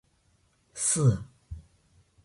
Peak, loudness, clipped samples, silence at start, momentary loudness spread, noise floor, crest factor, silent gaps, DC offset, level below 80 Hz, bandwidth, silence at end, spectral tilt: -12 dBFS; -26 LUFS; under 0.1%; 0.75 s; 23 LU; -68 dBFS; 20 dB; none; under 0.1%; -52 dBFS; 11.5 kHz; 0.65 s; -5 dB/octave